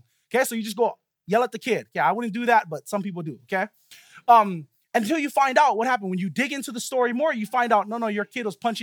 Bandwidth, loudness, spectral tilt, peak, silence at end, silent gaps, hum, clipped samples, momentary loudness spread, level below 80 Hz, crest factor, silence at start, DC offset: 19 kHz; -23 LUFS; -4.5 dB/octave; -4 dBFS; 0 s; none; none; under 0.1%; 11 LU; -80 dBFS; 20 dB; 0.3 s; under 0.1%